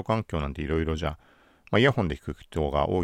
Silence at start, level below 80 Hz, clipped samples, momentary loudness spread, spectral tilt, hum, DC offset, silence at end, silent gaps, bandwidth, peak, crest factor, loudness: 0 s; -40 dBFS; under 0.1%; 12 LU; -7 dB/octave; none; under 0.1%; 0 s; none; 12 kHz; -8 dBFS; 20 dB; -27 LUFS